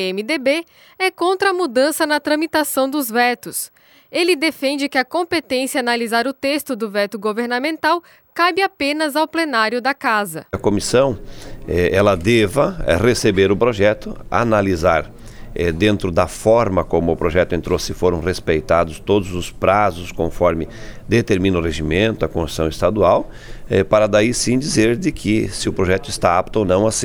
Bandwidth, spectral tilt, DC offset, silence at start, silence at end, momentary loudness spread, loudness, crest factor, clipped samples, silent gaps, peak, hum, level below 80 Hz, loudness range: over 20 kHz; -5 dB/octave; under 0.1%; 0 s; 0 s; 7 LU; -18 LUFS; 16 dB; under 0.1%; none; 0 dBFS; none; -36 dBFS; 3 LU